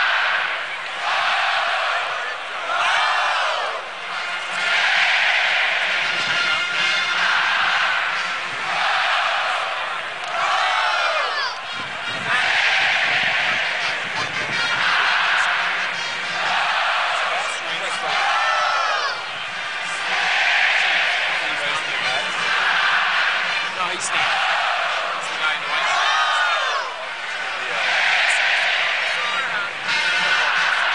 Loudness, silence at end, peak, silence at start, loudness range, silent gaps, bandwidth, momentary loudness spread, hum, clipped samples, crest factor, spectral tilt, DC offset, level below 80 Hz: -19 LUFS; 0 s; -6 dBFS; 0 s; 2 LU; none; 10.5 kHz; 8 LU; none; under 0.1%; 16 dB; 0 dB/octave; 0.4%; -68 dBFS